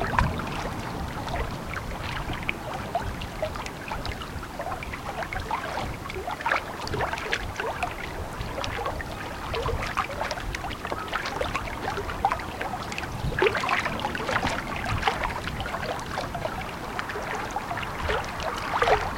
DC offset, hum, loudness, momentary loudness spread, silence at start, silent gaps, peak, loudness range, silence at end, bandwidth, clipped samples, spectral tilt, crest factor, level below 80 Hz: under 0.1%; none; -30 LUFS; 8 LU; 0 s; none; -2 dBFS; 5 LU; 0 s; 17 kHz; under 0.1%; -4.5 dB/octave; 26 dB; -40 dBFS